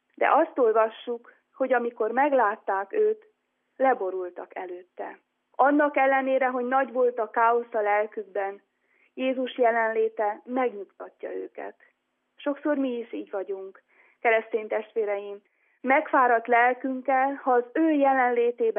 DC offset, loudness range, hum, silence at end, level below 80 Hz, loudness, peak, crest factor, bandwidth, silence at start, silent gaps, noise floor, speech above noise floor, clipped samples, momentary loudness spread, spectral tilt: under 0.1%; 6 LU; none; 0 s; under -90 dBFS; -25 LUFS; -8 dBFS; 18 dB; 3.7 kHz; 0.2 s; none; -59 dBFS; 34 dB; under 0.1%; 16 LU; -8 dB/octave